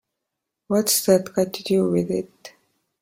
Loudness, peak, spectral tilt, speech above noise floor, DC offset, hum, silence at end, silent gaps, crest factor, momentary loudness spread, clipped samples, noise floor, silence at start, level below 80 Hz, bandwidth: -21 LUFS; -4 dBFS; -4.5 dB/octave; 61 dB; under 0.1%; none; 0.55 s; none; 20 dB; 9 LU; under 0.1%; -82 dBFS; 0.7 s; -62 dBFS; 16.5 kHz